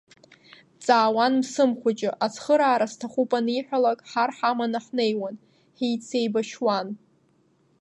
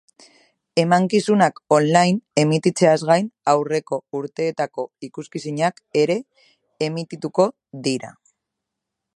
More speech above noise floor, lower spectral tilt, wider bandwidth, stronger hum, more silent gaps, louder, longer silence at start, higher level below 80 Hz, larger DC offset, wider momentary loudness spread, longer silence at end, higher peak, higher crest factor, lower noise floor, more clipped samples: second, 40 dB vs 62 dB; about the same, -4.5 dB/octave vs -5.5 dB/octave; about the same, 11 kHz vs 11.5 kHz; neither; neither; second, -24 LUFS vs -20 LUFS; about the same, 0.8 s vs 0.75 s; second, -80 dBFS vs -68 dBFS; neither; second, 8 LU vs 12 LU; second, 0.85 s vs 1.05 s; second, -4 dBFS vs 0 dBFS; about the same, 20 dB vs 20 dB; second, -64 dBFS vs -82 dBFS; neither